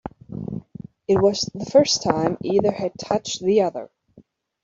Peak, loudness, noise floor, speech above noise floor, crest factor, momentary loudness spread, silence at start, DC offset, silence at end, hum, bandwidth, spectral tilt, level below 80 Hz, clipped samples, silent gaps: -4 dBFS; -21 LUFS; -54 dBFS; 34 dB; 18 dB; 17 LU; 0.05 s; under 0.1%; 0.45 s; none; 7.8 kHz; -4.5 dB/octave; -56 dBFS; under 0.1%; none